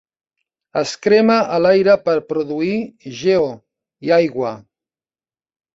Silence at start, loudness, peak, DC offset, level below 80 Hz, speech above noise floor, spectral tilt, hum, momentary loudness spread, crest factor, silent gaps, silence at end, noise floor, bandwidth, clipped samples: 0.75 s; -17 LUFS; -2 dBFS; under 0.1%; -58 dBFS; over 74 dB; -5.5 dB/octave; none; 13 LU; 16 dB; none; 1.15 s; under -90 dBFS; 8 kHz; under 0.1%